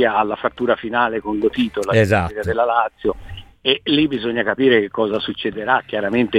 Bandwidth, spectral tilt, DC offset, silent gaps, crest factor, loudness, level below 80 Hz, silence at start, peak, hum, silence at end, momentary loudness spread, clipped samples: 14.5 kHz; -6 dB/octave; under 0.1%; none; 18 dB; -19 LUFS; -44 dBFS; 0 s; -2 dBFS; none; 0 s; 7 LU; under 0.1%